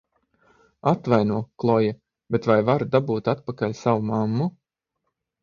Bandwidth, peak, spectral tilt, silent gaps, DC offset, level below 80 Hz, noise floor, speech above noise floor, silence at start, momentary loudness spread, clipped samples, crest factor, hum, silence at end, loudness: 7.2 kHz; -4 dBFS; -8.5 dB/octave; none; under 0.1%; -60 dBFS; -79 dBFS; 57 dB; 0.85 s; 7 LU; under 0.1%; 20 dB; none; 0.9 s; -23 LUFS